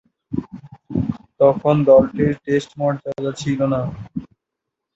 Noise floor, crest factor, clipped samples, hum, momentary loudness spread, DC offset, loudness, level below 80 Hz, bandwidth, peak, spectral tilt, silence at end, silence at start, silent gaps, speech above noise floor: -81 dBFS; 18 dB; under 0.1%; none; 15 LU; under 0.1%; -19 LUFS; -46 dBFS; 8 kHz; -2 dBFS; -7.5 dB/octave; 0.7 s; 0.3 s; none; 64 dB